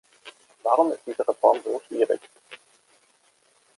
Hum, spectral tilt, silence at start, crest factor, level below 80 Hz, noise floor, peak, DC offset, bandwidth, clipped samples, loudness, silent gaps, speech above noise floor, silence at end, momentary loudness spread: none; -4 dB/octave; 0.25 s; 22 dB; -80 dBFS; -63 dBFS; -4 dBFS; under 0.1%; 11.5 kHz; under 0.1%; -24 LUFS; none; 40 dB; 1.2 s; 25 LU